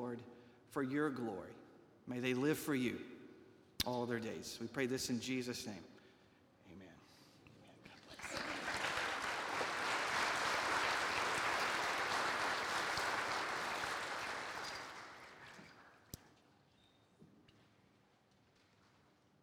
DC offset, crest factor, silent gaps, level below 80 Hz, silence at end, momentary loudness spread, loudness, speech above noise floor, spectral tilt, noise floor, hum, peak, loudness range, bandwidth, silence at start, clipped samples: under 0.1%; 24 dB; none; -72 dBFS; 2.2 s; 21 LU; -39 LUFS; 32 dB; -3 dB/octave; -72 dBFS; none; -18 dBFS; 13 LU; 19.5 kHz; 0 s; under 0.1%